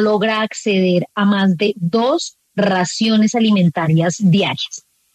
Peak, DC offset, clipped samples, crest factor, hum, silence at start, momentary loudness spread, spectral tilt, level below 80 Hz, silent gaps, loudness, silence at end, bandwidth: -4 dBFS; under 0.1%; under 0.1%; 12 dB; none; 0 s; 6 LU; -5.5 dB/octave; -62 dBFS; none; -16 LUFS; 0.35 s; 9.2 kHz